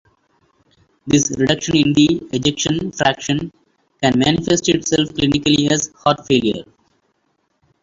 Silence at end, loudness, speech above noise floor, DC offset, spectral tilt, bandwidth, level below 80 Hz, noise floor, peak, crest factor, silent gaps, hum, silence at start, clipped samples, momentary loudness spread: 1.2 s; -17 LUFS; 50 dB; under 0.1%; -4 dB/octave; 7.8 kHz; -46 dBFS; -66 dBFS; -2 dBFS; 16 dB; none; none; 1.05 s; under 0.1%; 7 LU